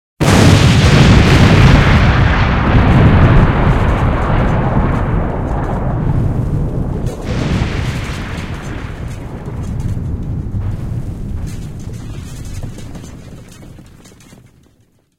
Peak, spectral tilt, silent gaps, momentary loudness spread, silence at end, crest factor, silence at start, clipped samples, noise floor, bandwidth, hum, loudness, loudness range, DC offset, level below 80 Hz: 0 dBFS; -6.5 dB/octave; none; 19 LU; 1.35 s; 12 dB; 0.2 s; 0.2%; -54 dBFS; 14.5 kHz; none; -13 LUFS; 18 LU; under 0.1%; -20 dBFS